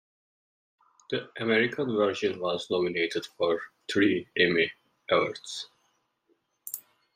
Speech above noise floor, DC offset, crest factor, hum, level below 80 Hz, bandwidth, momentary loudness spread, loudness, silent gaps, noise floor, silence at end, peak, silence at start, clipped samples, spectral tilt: 45 dB; under 0.1%; 20 dB; none; -72 dBFS; 16 kHz; 14 LU; -28 LUFS; none; -73 dBFS; 0.35 s; -10 dBFS; 1.1 s; under 0.1%; -4.5 dB/octave